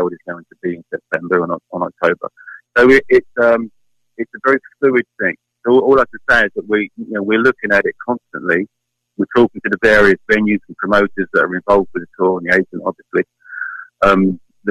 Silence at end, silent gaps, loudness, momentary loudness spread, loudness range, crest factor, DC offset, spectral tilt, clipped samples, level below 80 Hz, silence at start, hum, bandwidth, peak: 0 s; none; -15 LUFS; 14 LU; 3 LU; 16 dB; under 0.1%; -6.5 dB/octave; under 0.1%; -44 dBFS; 0 s; none; 10.5 kHz; 0 dBFS